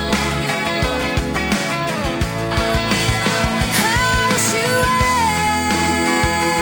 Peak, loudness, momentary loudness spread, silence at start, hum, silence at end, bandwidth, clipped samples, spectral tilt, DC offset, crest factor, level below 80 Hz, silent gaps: -4 dBFS; -17 LUFS; 5 LU; 0 s; none; 0 s; over 20 kHz; under 0.1%; -3.5 dB/octave; under 0.1%; 14 dB; -30 dBFS; none